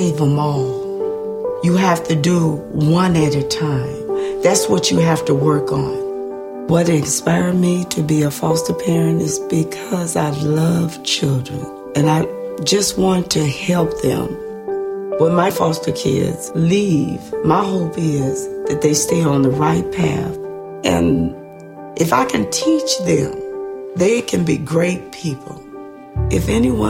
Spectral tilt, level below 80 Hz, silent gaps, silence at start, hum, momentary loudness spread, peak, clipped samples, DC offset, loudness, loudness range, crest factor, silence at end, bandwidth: -5.5 dB/octave; -40 dBFS; none; 0 s; none; 10 LU; -2 dBFS; under 0.1%; under 0.1%; -17 LUFS; 2 LU; 16 dB; 0 s; 16.5 kHz